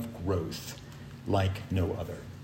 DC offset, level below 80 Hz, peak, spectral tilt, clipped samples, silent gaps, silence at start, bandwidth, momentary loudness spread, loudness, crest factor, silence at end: under 0.1%; -56 dBFS; -16 dBFS; -6.5 dB/octave; under 0.1%; none; 0 s; 16.5 kHz; 13 LU; -33 LUFS; 18 dB; 0 s